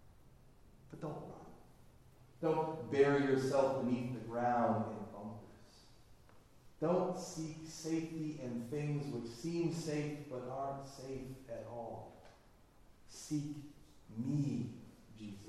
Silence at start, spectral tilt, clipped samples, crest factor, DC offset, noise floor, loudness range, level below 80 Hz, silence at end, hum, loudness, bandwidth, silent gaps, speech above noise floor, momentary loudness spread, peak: 0 s; -6.5 dB/octave; under 0.1%; 22 dB; under 0.1%; -64 dBFS; 11 LU; -66 dBFS; 0 s; none; -39 LUFS; 13.5 kHz; none; 26 dB; 19 LU; -18 dBFS